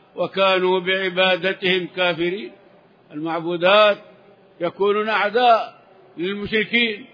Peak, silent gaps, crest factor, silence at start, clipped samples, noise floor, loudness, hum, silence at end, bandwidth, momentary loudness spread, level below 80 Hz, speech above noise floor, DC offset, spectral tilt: -2 dBFS; none; 18 dB; 0.15 s; under 0.1%; -52 dBFS; -19 LUFS; none; 0.1 s; 5.2 kHz; 13 LU; -62 dBFS; 32 dB; under 0.1%; -6.5 dB/octave